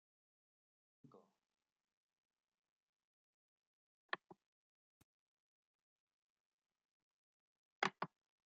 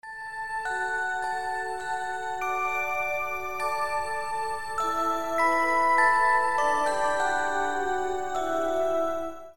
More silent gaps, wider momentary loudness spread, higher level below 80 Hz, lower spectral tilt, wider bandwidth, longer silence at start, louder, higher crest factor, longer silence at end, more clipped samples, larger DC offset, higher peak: first, 1.93-2.09 s, 2.18-2.29 s, 2.58-4.09 s, 4.46-6.07 s, 6.13-6.59 s, 6.85-7.82 s vs none; about the same, 9 LU vs 9 LU; second, under -90 dBFS vs -56 dBFS; second, -1 dB/octave vs -2.5 dB/octave; second, 4.5 kHz vs 17 kHz; first, 1.15 s vs 0 s; second, -46 LUFS vs -27 LUFS; first, 36 dB vs 16 dB; first, 0.4 s vs 0 s; neither; second, under 0.1% vs 1%; second, -20 dBFS vs -12 dBFS